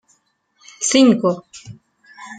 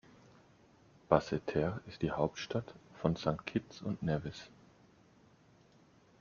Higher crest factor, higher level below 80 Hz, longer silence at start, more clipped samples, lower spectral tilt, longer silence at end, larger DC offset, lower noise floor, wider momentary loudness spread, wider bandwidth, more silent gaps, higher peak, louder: second, 18 dB vs 28 dB; about the same, -64 dBFS vs -62 dBFS; second, 0.8 s vs 1.1 s; neither; second, -4 dB/octave vs -6 dB/octave; second, 0 s vs 1.75 s; neither; about the same, -63 dBFS vs -65 dBFS; first, 26 LU vs 12 LU; first, 9.4 kHz vs 7.2 kHz; neither; first, -2 dBFS vs -10 dBFS; first, -16 LUFS vs -36 LUFS